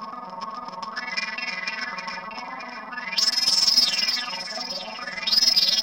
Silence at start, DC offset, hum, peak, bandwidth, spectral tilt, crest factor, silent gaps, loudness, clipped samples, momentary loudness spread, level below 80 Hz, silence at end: 0 s; under 0.1%; none; -8 dBFS; 16.5 kHz; 0.5 dB/octave; 18 dB; none; -21 LUFS; under 0.1%; 18 LU; -62 dBFS; 0 s